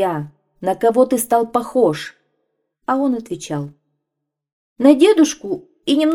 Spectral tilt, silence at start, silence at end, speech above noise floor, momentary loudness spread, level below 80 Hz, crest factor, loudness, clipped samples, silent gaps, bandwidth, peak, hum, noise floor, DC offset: -5 dB/octave; 0 s; 0 s; 64 dB; 16 LU; -60 dBFS; 18 dB; -17 LUFS; under 0.1%; 4.52-4.76 s; 16.5 kHz; 0 dBFS; none; -80 dBFS; under 0.1%